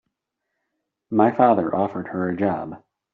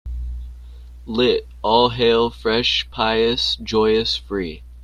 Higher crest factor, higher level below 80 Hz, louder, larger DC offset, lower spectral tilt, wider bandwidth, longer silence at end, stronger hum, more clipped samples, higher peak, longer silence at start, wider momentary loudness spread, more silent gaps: about the same, 18 dB vs 20 dB; second, -64 dBFS vs -36 dBFS; about the same, -21 LUFS vs -19 LUFS; neither; first, -7.5 dB/octave vs -5 dB/octave; second, 4.5 kHz vs 10.5 kHz; first, 0.35 s vs 0 s; second, none vs 60 Hz at -35 dBFS; neither; second, -4 dBFS vs 0 dBFS; first, 1.1 s vs 0.05 s; second, 11 LU vs 14 LU; neither